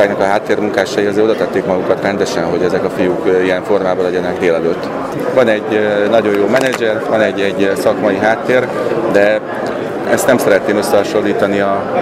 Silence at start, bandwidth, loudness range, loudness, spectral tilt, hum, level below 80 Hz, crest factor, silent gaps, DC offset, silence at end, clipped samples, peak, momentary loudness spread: 0 s; 16 kHz; 1 LU; -14 LUFS; -5 dB/octave; none; -50 dBFS; 14 dB; none; under 0.1%; 0 s; under 0.1%; 0 dBFS; 4 LU